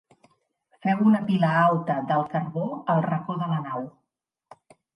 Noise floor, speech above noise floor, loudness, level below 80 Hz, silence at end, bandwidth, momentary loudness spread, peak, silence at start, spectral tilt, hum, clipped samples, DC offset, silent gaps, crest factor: -83 dBFS; 59 dB; -24 LUFS; -72 dBFS; 1.05 s; 5.6 kHz; 10 LU; -8 dBFS; 0.85 s; -9 dB/octave; none; under 0.1%; under 0.1%; none; 18 dB